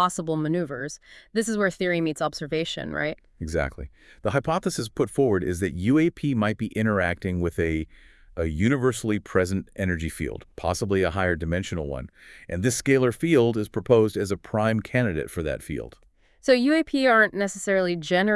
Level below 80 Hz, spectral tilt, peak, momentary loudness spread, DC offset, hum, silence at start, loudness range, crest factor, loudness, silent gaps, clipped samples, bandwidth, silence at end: -46 dBFS; -5.5 dB/octave; -4 dBFS; 11 LU; under 0.1%; none; 0 s; 4 LU; 20 dB; -25 LUFS; none; under 0.1%; 12 kHz; 0 s